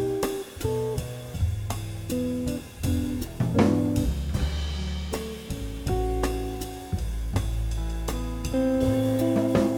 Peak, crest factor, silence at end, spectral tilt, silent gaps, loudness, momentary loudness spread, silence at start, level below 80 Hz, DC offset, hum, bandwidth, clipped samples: -8 dBFS; 18 dB; 0 s; -6.5 dB/octave; none; -28 LUFS; 10 LU; 0 s; -34 dBFS; under 0.1%; none; 18.5 kHz; under 0.1%